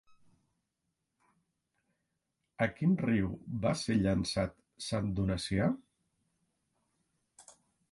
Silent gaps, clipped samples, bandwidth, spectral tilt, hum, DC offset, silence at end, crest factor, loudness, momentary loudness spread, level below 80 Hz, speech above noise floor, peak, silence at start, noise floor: none; under 0.1%; 11.5 kHz; -6 dB/octave; none; under 0.1%; 0.5 s; 22 dB; -33 LUFS; 7 LU; -54 dBFS; 53 dB; -14 dBFS; 2.6 s; -84 dBFS